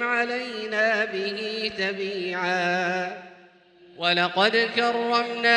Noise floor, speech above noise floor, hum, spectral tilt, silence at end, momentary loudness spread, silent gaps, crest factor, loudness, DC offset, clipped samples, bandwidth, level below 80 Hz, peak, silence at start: -53 dBFS; 29 dB; none; -4 dB/octave; 0 s; 8 LU; none; 18 dB; -24 LUFS; under 0.1%; under 0.1%; 11 kHz; -70 dBFS; -6 dBFS; 0 s